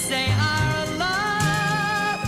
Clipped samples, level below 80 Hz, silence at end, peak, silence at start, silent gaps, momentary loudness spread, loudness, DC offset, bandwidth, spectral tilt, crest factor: under 0.1%; -42 dBFS; 0 s; -10 dBFS; 0 s; none; 3 LU; -22 LUFS; under 0.1%; 16 kHz; -4 dB/octave; 12 dB